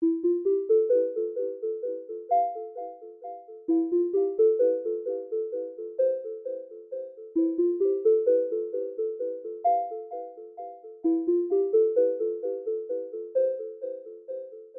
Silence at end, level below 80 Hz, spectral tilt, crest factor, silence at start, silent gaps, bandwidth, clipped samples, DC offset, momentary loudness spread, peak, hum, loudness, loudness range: 0 s; -84 dBFS; -10 dB/octave; 14 dB; 0 s; none; 2.2 kHz; under 0.1%; under 0.1%; 16 LU; -12 dBFS; none; -27 LUFS; 2 LU